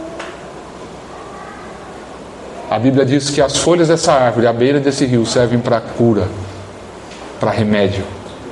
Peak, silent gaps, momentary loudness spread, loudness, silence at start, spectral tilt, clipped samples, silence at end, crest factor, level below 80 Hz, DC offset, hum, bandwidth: 0 dBFS; none; 20 LU; -14 LUFS; 0 s; -5.5 dB/octave; under 0.1%; 0 s; 16 dB; -46 dBFS; under 0.1%; none; 11.5 kHz